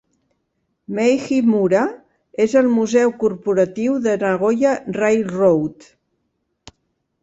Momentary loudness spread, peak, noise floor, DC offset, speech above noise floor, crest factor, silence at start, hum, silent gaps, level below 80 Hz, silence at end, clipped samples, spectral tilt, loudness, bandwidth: 6 LU; -4 dBFS; -71 dBFS; under 0.1%; 55 dB; 16 dB; 0.9 s; none; none; -58 dBFS; 1.5 s; under 0.1%; -6.5 dB/octave; -18 LUFS; 8 kHz